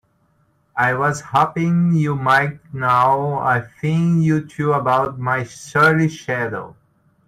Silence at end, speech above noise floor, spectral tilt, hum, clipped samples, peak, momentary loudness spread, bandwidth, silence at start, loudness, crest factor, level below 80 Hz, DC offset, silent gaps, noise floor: 0.55 s; 43 dB; -7 dB/octave; none; under 0.1%; -2 dBFS; 8 LU; 12.5 kHz; 0.75 s; -18 LUFS; 16 dB; -54 dBFS; under 0.1%; none; -61 dBFS